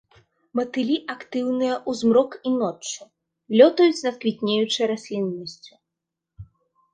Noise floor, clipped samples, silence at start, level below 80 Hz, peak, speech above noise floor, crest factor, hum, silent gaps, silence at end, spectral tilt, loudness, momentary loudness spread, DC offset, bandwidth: -84 dBFS; under 0.1%; 0.55 s; -62 dBFS; -2 dBFS; 62 dB; 22 dB; none; none; 0.5 s; -4.5 dB/octave; -22 LUFS; 14 LU; under 0.1%; 9.8 kHz